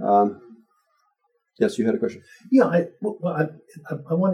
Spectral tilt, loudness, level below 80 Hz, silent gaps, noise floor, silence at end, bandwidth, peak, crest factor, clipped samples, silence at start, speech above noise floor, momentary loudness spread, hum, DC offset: -8 dB/octave; -23 LUFS; -74 dBFS; none; -71 dBFS; 0 s; 11 kHz; -6 dBFS; 18 dB; under 0.1%; 0 s; 49 dB; 16 LU; none; under 0.1%